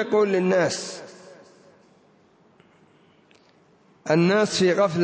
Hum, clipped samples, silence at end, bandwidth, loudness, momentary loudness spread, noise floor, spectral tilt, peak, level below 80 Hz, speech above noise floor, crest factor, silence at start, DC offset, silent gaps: none; under 0.1%; 0 s; 8 kHz; -21 LUFS; 18 LU; -58 dBFS; -5 dB/octave; -8 dBFS; -68 dBFS; 37 dB; 18 dB; 0 s; under 0.1%; none